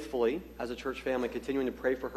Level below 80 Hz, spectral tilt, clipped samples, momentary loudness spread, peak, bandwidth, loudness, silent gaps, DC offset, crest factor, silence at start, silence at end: -54 dBFS; -5.5 dB/octave; under 0.1%; 6 LU; -18 dBFS; 13.5 kHz; -34 LUFS; none; under 0.1%; 16 dB; 0 s; 0 s